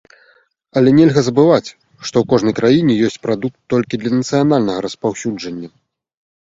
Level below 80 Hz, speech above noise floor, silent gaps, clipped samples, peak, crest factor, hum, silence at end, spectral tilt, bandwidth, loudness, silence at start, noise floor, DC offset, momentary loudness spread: -52 dBFS; 40 dB; none; under 0.1%; 0 dBFS; 16 dB; none; 0.8 s; -6.5 dB/octave; 7.8 kHz; -15 LUFS; 0.75 s; -55 dBFS; under 0.1%; 14 LU